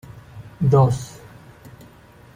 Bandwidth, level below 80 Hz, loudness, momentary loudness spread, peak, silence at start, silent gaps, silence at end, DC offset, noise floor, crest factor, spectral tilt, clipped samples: 14.5 kHz; -48 dBFS; -19 LUFS; 26 LU; -4 dBFS; 0.1 s; none; 1.3 s; under 0.1%; -47 dBFS; 18 dB; -8 dB/octave; under 0.1%